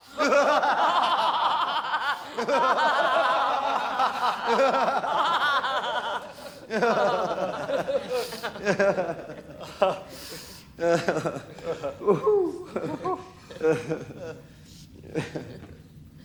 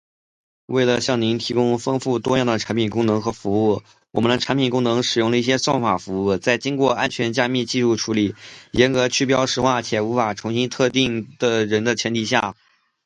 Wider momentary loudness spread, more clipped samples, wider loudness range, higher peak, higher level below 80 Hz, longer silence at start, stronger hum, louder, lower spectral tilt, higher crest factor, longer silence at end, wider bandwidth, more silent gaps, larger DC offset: first, 17 LU vs 4 LU; neither; first, 6 LU vs 1 LU; second, -8 dBFS vs 0 dBFS; second, -62 dBFS vs -52 dBFS; second, 0.05 s vs 0.7 s; neither; second, -25 LUFS vs -20 LUFS; about the same, -4 dB/octave vs -4.5 dB/octave; about the same, 18 dB vs 20 dB; second, 0.05 s vs 0.55 s; first, over 20 kHz vs 10.5 kHz; neither; neither